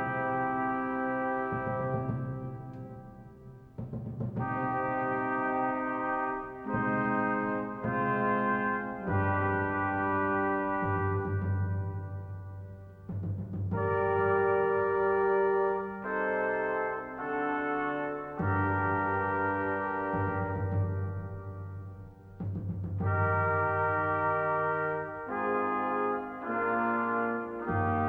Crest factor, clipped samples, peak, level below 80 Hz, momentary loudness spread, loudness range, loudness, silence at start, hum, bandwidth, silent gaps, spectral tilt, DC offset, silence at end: 14 dB; under 0.1%; -16 dBFS; -58 dBFS; 13 LU; 5 LU; -31 LUFS; 0 s; none; 3.9 kHz; none; -10.5 dB/octave; under 0.1%; 0 s